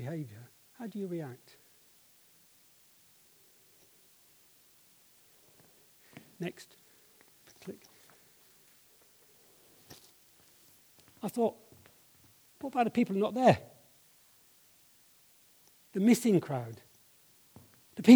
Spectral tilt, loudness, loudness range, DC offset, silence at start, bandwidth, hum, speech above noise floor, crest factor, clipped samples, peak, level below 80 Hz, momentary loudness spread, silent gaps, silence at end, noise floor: -6 dB/octave; -32 LUFS; 22 LU; under 0.1%; 0 s; over 20 kHz; none; 33 dB; 26 dB; under 0.1%; -8 dBFS; -78 dBFS; 28 LU; none; 0 s; -63 dBFS